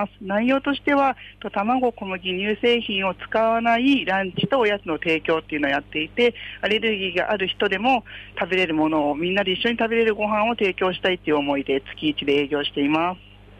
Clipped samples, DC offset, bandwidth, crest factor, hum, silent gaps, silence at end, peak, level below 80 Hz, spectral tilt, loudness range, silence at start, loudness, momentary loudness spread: under 0.1%; under 0.1%; 9 kHz; 12 dB; none; none; 0.45 s; -10 dBFS; -52 dBFS; -6 dB/octave; 1 LU; 0 s; -22 LUFS; 5 LU